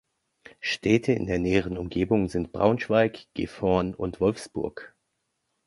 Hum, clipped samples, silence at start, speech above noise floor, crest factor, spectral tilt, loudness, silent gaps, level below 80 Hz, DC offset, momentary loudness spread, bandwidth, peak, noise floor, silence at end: none; under 0.1%; 0.6 s; 52 dB; 20 dB; -6.5 dB/octave; -26 LUFS; none; -48 dBFS; under 0.1%; 10 LU; 11.5 kHz; -6 dBFS; -78 dBFS; 0.8 s